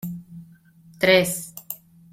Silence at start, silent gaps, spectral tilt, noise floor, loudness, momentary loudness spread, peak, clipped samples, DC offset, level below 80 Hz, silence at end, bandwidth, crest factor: 0.05 s; none; -3.5 dB/octave; -51 dBFS; -20 LUFS; 19 LU; -4 dBFS; under 0.1%; under 0.1%; -62 dBFS; 0.35 s; 16.5 kHz; 22 dB